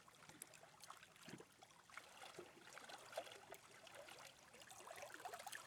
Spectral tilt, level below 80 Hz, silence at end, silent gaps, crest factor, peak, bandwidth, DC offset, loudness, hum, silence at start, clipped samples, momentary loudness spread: -2 dB/octave; under -90 dBFS; 0 s; none; 26 dB; -32 dBFS; 19.5 kHz; under 0.1%; -58 LUFS; none; 0 s; under 0.1%; 7 LU